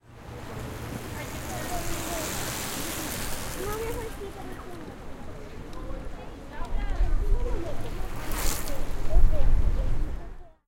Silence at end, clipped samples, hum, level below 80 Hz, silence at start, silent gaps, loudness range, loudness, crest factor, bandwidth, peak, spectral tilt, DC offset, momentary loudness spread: 0.2 s; under 0.1%; none; -28 dBFS; 0.1 s; none; 7 LU; -33 LUFS; 20 dB; 17 kHz; -6 dBFS; -4 dB/octave; under 0.1%; 14 LU